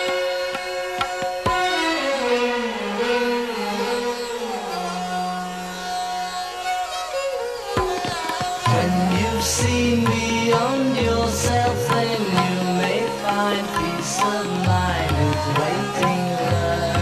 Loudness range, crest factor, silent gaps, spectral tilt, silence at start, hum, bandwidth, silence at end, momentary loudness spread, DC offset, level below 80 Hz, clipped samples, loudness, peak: 6 LU; 14 dB; none; -4.5 dB/octave; 0 s; none; 14 kHz; 0 s; 7 LU; under 0.1%; -40 dBFS; under 0.1%; -22 LUFS; -6 dBFS